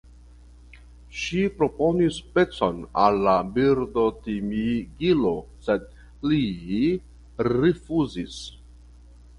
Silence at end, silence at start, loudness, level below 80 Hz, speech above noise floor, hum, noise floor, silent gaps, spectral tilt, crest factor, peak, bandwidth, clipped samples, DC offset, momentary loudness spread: 0.7 s; 0.75 s; -24 LUFS; -46 dBFS; 25 dB; none; -48 dBFS; none; -6.5 dB/octave; 20 dB; -4 dBFS; 11 kHz; under 0.1%; under 0.1%; 10 LU